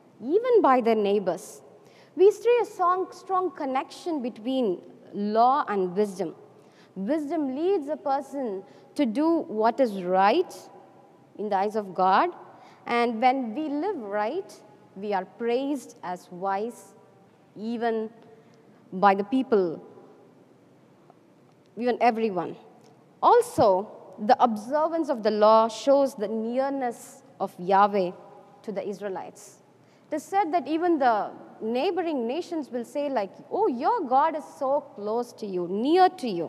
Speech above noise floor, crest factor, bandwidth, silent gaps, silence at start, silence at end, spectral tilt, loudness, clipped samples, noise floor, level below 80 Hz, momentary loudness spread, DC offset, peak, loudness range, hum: 32 dB; 20 dB; 14 kHz; none; 0.2 s; 0 s; -5.5 dB/octave; -25 LUFS; under 0.1%; -57 dBFS; -78 dBFS; 15 LU; under 0.1%; -6 dBFS; 7 LU; none